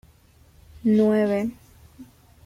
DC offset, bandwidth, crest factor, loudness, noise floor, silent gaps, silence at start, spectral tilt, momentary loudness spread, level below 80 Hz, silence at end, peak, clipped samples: under 0.1%; 13.5 kHz; 16 dB; -22 LUFS; -55 dBFS; none; 0.75 s; -8 dB/octave; 9 LU; -56 dBFS; 0.4 s; -10 dBFS; under 0.1%